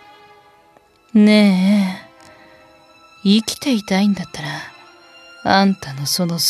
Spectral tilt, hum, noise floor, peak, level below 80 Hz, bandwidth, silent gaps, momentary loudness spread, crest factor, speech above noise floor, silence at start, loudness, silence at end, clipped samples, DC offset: -5 dB/octave; none; -52 dBFS; 0 dBFS; -58 dBFS; 14.5 kHz; none; 15 LU; 18 dB; 37 dB; 1.15 s; -17 LUFS; 0 s; under 0.1%; under 0.1%